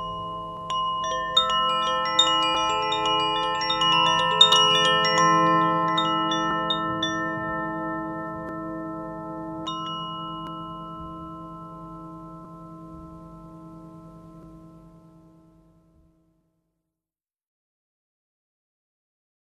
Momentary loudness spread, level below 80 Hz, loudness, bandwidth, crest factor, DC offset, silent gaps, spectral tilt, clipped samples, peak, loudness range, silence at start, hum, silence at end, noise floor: 23 LU; -56 dBFS; -22 LUFS; 14.5 kHz; 24 dB; under 0.1%; none; -3 dB/octave; under 0.1%; -2 dBFS; 22 LU; 0 s; none; 4.7 s; under -90 dBFS